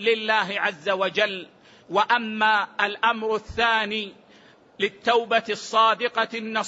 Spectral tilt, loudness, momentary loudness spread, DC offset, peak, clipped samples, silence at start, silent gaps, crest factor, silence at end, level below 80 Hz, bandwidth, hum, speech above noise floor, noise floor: -3 dB/octave; -23 LUFS; 7 LU; under 0.1%; -6 dBFS; under 0.1%; 0 s; none; 18 dB; 0 s; -58 dBFS; 8 kHz; none; 30 dB; -53 dBFS